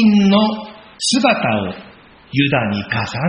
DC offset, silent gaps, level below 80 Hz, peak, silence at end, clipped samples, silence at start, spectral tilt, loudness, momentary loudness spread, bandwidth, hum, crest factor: under 0.1%; none; -50 dBFS; -2 dBFS; 0 s; under 0.1%; 0 s; -4.5 dB/octave; -16 LUFS; 15 LU; 8 kHz; none; 16 dB